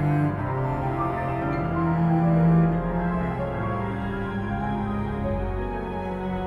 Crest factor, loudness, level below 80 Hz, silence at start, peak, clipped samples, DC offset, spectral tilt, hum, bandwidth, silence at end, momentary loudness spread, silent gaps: 14 dB; -25 LUFS; -38 dBFS; 0 s; -10 dBFS; under 0.1%; under 0.1%; -10 dB/octave; none; 4.5 kHz; 0 s; 9 LU; none